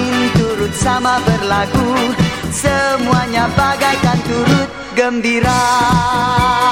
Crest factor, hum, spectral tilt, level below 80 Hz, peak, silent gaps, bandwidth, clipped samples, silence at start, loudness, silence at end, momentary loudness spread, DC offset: 14 dB; none; -5 dB/octave; -32 dBFS; 0 dBFS; none; 16.5 kHz; under 0.1%; 0 s; -14 LUFS; 0 s; 4 LU; 0.3%